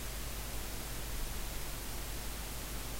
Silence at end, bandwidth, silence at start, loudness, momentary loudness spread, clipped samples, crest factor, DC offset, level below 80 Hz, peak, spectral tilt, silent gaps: 0 s; 16 kHz; 0 s; -42 LUFS; 1 LU; under 0.1%; 14 dB; under 0.1%; -44 dBFS; -26 dBFS; -3 dB/octave; none